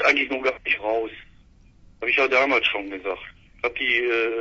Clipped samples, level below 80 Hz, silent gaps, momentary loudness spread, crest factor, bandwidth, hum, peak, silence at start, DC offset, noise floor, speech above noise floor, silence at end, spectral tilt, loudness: under 0.1%; -54 dBFS; none; 13 LU; 18 dB; 7.8 kHz; none; -6 dBFS; 0 s; under 0.1%; -53 dBFS; 29 dB; 0 s; -3 dB/octave; -22 LUFS